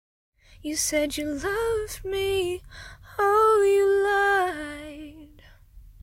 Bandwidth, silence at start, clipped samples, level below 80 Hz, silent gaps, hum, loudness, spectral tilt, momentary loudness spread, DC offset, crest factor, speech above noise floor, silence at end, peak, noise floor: 16 kHz; 0.65 s; under 0.1%; -48 dBFS; none; none; -24 LUFS; -3 dB/octave; 20 LU; under 0.1%; 14 dB; 28 dB; 0.15 s; -10 dBFS; -51 dBFS